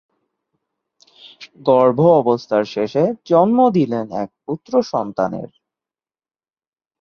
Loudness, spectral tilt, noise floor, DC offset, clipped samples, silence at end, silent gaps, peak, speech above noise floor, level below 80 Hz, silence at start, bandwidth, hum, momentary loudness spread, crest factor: -17 LUFS; -8 dB/octave; under -90 dBFS; under 0.1%; under 0.1%; 1.55 s; none; -2 dBFS; over 73 dB; -62 dBFS; 1.25 s; 6.8 kHz; none; 14 LU; 18 dB